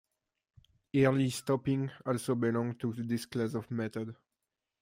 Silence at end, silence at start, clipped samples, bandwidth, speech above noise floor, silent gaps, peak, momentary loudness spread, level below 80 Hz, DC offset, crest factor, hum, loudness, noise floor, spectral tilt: 0.65 s; 0.95 s; under 0.1%; 16 kHz; 56 dB; none; -14 dBFS; 9 LU; -68 dBFS; under 0.1%; 20 dB; none; -33 LUFS; -88 dBFS; -6.5 dB/octave